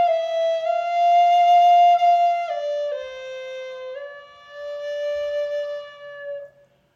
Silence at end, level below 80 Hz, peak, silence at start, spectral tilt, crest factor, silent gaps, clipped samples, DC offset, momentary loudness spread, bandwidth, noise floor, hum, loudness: 0.5 s; -70 dBFS; -8 dBFS; 0 s; -0.5 dB/octave; 12 dB; none; under 0.1%; under 0.1%; 20 LU; 7.2 kHz; -52 dBFS; none; -19 LUFS